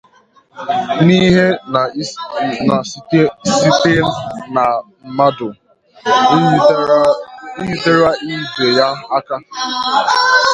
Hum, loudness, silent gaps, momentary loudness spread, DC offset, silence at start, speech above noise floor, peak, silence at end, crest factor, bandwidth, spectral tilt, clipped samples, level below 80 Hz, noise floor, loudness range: none; -14 LUFS; none; 12 LU; under 0.1%; 0.55 s; 37 dB; 0 dBFS; 0 s; 14 dB; 10.5 kHz; -5 dB/octave; under 0.1%; -48 dBFS; -50 dBFS; 2 LU